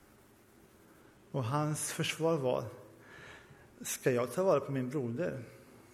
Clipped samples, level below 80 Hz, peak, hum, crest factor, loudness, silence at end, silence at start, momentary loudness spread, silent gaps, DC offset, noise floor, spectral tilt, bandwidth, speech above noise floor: under 0.1%; -70 dBFS; -16 dBFS; none; 20 dB; -34 LUFS; 0.1 s; 1.35 s; 22 LU; none; under 0.1%; -62 dBFS; -5 dB/octave; 16 kHz; 28 dB